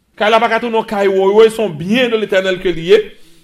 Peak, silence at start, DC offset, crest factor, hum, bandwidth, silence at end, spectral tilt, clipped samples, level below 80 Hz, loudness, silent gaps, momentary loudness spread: 0 dBFS; 0.2 s; under 0.1%; 14 dB; none; 13.5 kHz; 0.2 s; -5 dB/octave; under 0.1%; -42 dBFS; -13 LUFS; none; 7 LU